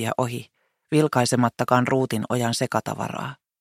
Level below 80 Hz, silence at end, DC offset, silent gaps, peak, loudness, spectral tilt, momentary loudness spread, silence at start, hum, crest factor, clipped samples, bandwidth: -64 dBFS; 0.25 s; under 0.1%; none; -2 dBFS; -23 LUFS; -5.5 dB/octave; 10 LU; 0 s; none; 22 dB; under 0.1%; 15.5 kHz